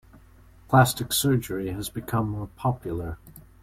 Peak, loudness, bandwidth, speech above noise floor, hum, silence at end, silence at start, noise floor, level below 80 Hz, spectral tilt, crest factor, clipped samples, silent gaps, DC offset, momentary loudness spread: -4 dBFS; -25 LUFS; 16.5 kHz; 27 dB; none; 0.25 s; 0.7 s; -52 dBFS; -48 dBFS; -5 dB/octave; 22 dB; under 0.1%; none; under 0.1%; 13 LU